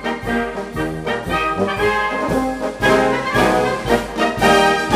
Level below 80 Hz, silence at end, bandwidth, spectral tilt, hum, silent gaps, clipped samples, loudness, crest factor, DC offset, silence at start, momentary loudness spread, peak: -36 dBFS; 0 s; 15.5 kHz; -4.5 dB/octave; none; none; under 0.1%; -17 LUFS; 16 dB; under 0.1%; 0 s; 9 LU; -2 dBFS